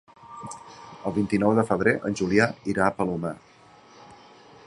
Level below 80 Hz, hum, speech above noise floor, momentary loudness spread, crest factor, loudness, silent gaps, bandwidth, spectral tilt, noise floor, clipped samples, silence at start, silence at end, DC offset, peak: -56 dBFS; none; 29 dB; 20 LU; 22 dB; -24 LUFS; none; 11.5 kHz; -6.5 dB/octave; -52 dBFS; under 0.1%; 0.25 s; 0.55 s; under 0.1%; -4 dBFS